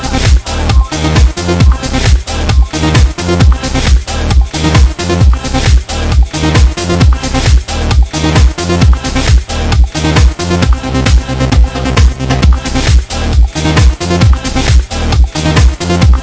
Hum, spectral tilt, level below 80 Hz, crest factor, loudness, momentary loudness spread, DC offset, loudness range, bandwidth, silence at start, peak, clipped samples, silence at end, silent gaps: none; -5.5 dB/octave; -10 dBFS; 8 dB; -10 LUFS; 3 LU; under 0.1%; 1 LU; 8 kHz; 0 s; 0 dBFS; 4%; 0 s; none